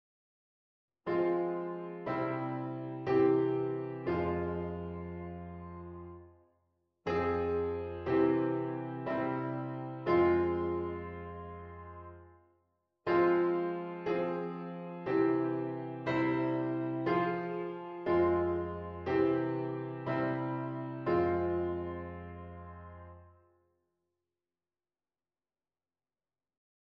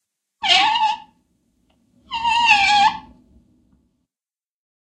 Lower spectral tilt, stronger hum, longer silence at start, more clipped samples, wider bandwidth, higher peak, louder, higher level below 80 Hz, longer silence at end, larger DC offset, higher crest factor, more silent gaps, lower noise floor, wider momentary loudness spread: first, -9.5 dB/octave vs 0 dB/octave; neither; first, 1.05 s vs 0.4 s; neither; second, 5.6 kHz vs 9.8 kHz; second, -16 dBFS vs 0 dBFS; second, -33 LUFS vs -16 LUFS; about the same, -60 dBFS vs -56 dBFS; first, 3.55 s vs 2 s; neither; about the same, 18 dB vs 20 dB; neither; about the same, under -90 dBFS vs under -90 dBFS; about the same, 17 LU vs 17 LU